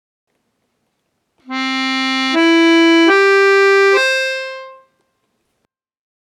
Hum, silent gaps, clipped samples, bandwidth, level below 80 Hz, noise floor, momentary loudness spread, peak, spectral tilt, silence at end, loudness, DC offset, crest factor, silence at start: none; none; under 0.1%; 12.5 kHz; -82 dBFS; -71 dBFS; 13 LU; 0 dBFS; -1 dB/octave; 1.6 s; -12 LUFS; under 0.1%; 14 dB; 1.5 s